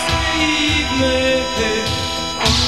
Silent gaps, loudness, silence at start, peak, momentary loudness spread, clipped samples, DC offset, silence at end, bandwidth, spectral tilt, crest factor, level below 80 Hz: none; -16 LUFS; 0 s; -2 dBFS; 4 LU; under 0.1%; 0.9%; 0 s; 15.5 kHz; -3.5 dB/octave; 16 dB; -30 dBFS